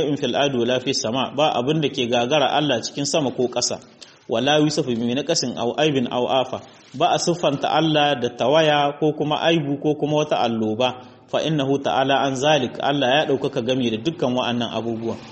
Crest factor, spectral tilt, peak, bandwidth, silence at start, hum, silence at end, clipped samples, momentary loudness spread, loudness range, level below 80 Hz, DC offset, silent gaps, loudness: 16 dB; -4.5 dB/octave; -4 dBFS; 8.4 kHz; 0 s; none; 0 s; under 0.1%; 6 LU; 2 LU; -60 dBFS; under 0.1%; none; -21 LUFS